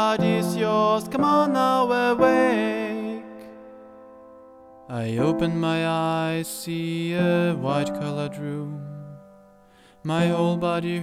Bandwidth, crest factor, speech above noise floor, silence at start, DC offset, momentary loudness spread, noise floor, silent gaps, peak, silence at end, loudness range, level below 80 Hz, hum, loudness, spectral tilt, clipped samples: 15.5 kHz; 16 dB; 31 dB; 0 s; under 0.1%; 16 LU; -54 dBFS; none; -6 dBFS; 0 s; 6 LU; -60 dBFS; none; -23 LUFS; -6 dB/octave; under 0.1%